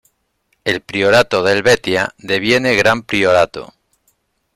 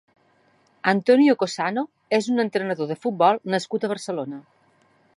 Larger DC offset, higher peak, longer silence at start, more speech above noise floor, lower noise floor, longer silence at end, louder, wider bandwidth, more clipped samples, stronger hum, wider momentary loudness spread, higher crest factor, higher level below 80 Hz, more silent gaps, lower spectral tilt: neither; first, 0 dBFS vs -4 dBFS; second, 0.65 s vs 0.85 s; first, 51 dB vs 40 dB; first, -65 dBFS vs -61 dBFS; first, 0.9 s vs 0.75 s; first, -14 LUFS vs -22 LUFS; first, 16 kHz vs 11.5 kHz; neither; neither; second, 8 LU vs 13 LU; about the same, 16 dB vs 20 dB; first, -48 dBFS vs -78 dBFS; neither; second, -4 dB/octave vs -5.5 dB/octave